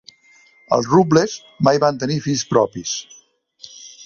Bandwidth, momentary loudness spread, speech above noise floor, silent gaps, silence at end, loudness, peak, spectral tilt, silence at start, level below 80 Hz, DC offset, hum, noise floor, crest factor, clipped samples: 7.6 kHz; 15 LU; 35 dB; none; 0 s; -18 LUFS; 0 dBFS; -5 dB/octave; 0.7 s; -56 dBFS; under 0.1%; none; -52 dBFS; 18 dB; under 0.1%